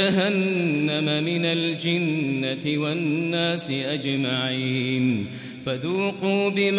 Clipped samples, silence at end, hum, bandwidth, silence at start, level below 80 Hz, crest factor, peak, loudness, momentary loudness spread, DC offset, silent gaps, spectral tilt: under 0.1%; 0 s; none; 4 kHz; 0 s; -64 dBFS; 16 dB; -8 dBFS; -24 LUFS; 4 LU; under 0.1%; none; -10.5 dB/octave